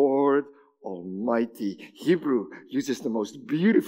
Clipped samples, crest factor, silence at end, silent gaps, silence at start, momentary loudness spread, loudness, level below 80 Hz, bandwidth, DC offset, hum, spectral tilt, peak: under 0.1%; 16 dB; 0 s; none; 0 s; 14 LU; -27 LUFS; -84 dBFS; 16 kHz; under 0.1%; none; -6.5 dB/octave; -10 dBFS